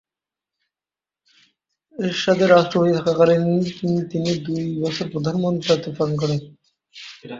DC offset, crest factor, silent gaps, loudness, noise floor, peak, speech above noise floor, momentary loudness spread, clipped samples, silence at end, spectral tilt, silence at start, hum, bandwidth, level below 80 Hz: under 0.1%; 20 dB; none; -20 LUFS; under -90 dBFS; -2 dBFS; over 70 dB; 12 LU; under 0.1%; 0 s; -6.5 dB/octave; 2 s; none; 7.6 kHz; -58 dBFS